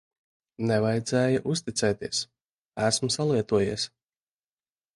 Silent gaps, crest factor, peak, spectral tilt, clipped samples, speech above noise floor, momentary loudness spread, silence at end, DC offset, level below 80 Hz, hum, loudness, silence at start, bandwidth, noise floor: 2.45-2.72 s; 18 dB; -10 dBFS; -4.5 dB/octave; under 0.1%; over 64 dB; 8 LU; 1.1 s; under 0.1%; -58 dBFS; none; -26 LUFS; 0.6 s; 11.5 kHz; under -90 dBFS